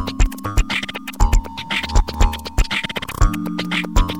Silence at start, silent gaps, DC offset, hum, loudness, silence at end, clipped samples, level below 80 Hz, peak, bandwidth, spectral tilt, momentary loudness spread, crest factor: 0 s; none; 0.8%; none; -21 LUFS; 0 s; under 0.1%; -20 dBFS; 0 dBFS; 17 kHz; -4.5 dB/octave; 4 LU; 18 dB